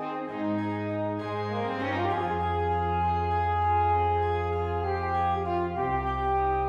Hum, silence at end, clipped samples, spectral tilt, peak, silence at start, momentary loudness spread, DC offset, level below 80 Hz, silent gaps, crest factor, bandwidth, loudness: none; 0 s; under 0.1%; -8.5 dB/octave; -14 dBFS; 0 s; 6 LU; under 0.1%; -42 dBFS; none; 14 dB; 7 kHz; -28 LUFS